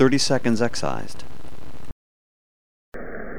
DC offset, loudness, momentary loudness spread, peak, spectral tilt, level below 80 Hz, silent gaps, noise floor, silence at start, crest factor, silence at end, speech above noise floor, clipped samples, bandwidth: 7%; -23 LUFS; 23 LU; -6 dBFS; -4.5 dB/octave; -46 dBFS; 1.92-2.92 s; -43 dBFS; 0 s; 20 dB; 0 s; 22 dB; under 0.1%; 17.5 kHz